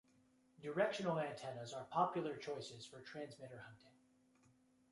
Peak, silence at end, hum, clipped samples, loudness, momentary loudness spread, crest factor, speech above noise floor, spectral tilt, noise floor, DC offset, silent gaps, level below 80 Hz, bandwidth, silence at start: -22 dBFS; 1 s; none; under 0.1%; -43 LUFS; 16 LU; 24 dB; 30 dB; -5.5 dB/octave; -74 dBFS; under 0.1%; none; -84 dBFS; 11.5 kHz; 0.6 s